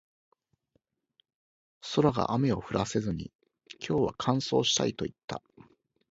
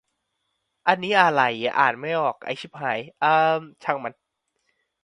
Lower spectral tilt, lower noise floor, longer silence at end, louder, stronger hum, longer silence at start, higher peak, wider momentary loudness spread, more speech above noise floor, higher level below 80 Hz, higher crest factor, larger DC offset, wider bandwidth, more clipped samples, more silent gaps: about the same, -5 dB/octave vs -5 dB/octave; about the same, -76 dBFS vs -76 dBFS; second, 0.75 s vs 0.9 s; second, -29 LUFS vs -22 LUFS; neither; first, 1.85 s vs 0.85 s; second, -10 dBFS vs -2 dBFS; first, 15 LU vs 11 LU; second, 47 dB vs 54 dB; first, -58 dBFS vs -72 dBFS; about the same, 22 dB vs 22 dB; neither; second, 8 kHz vs 11 kHz; neither; first, 3.35-3.39 s, 5.24-5.28 s vs none